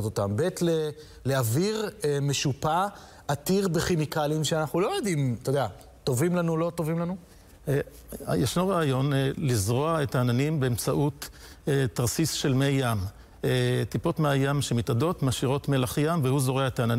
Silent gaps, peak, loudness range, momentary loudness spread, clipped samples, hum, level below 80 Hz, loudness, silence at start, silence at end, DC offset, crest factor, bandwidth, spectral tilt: none; -12 dBFS; 2 LU; 7 LU; under 0.1%; none; -52 dBFS; -27 LUFS; 0 s; 0 s; under 0.1%; 14 dB; 16 kHz; -5.5 dB/octave